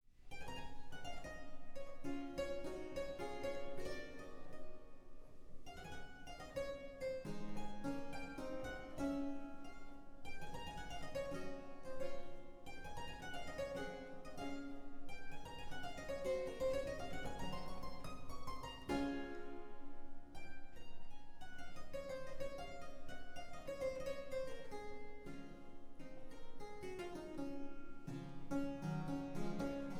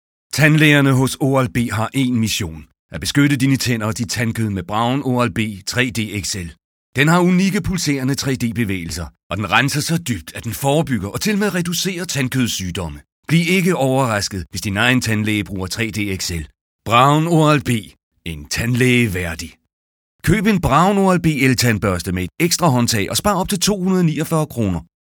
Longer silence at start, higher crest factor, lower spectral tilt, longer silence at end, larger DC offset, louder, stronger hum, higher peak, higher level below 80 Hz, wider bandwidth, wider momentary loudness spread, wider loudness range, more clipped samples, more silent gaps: second, 0.05 s vs 0.35 s; about the same, 16 dB vs 18 dB; about the same, -5.5 dB/octave vs -5 dB/octave; second, 0 s vs 0.2 s; neither; second, -48 LUFS vs -17 LUFS; neither; second, -28 dBFS vs 0 dBFS; second, -56 dBFS vs -42 dBFS; second, 13 kHz vs 19.5 kHz; about the same, 14 LU vs 12 LU; first, 6 LU vs 3 LU; neither; second, none vs 2.79-2.89 s, 6.64-6.93 s, 9.23-9.30 s, 13.12-13.23 s, 16.61-16.79 s, 18.03-18.11 s, 19.73-20.19 s